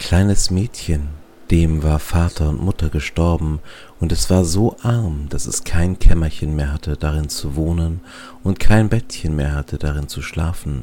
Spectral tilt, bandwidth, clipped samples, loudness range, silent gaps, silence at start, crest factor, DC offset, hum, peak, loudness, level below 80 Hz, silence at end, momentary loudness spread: -5.5 dB/octave; 17 kHz; under 0.1%; 2 LU; none; 0 s; 16 dB; under 0.1%; none; 0 dBFS; -20 LUFS; -22 dBFS; 0 s; 8 LU